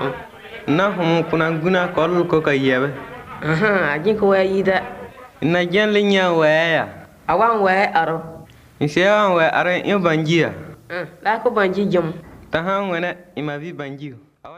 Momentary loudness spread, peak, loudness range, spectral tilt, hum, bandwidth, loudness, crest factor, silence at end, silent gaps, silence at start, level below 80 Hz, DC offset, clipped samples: 15 LU; -2 dBFS; 4 LU; -6.5 dB/octave; none; 15 kHz; -18 LUFS; 18 dB; 0 s; none; 0 s; -54 dBFS; under 0.1%; under 0.1%